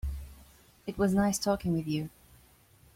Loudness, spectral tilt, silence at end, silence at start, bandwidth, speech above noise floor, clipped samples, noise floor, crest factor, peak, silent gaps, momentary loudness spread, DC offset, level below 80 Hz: -30 LUFS; -5.5 dB/octave; 0.9 s; 0.05 s; 16.5 kHz; 32 dB; under 0.1%; -61 dBFS; 18 dB; -14 dBFS; none; 17 LU; under 0.1%; -46 dBFS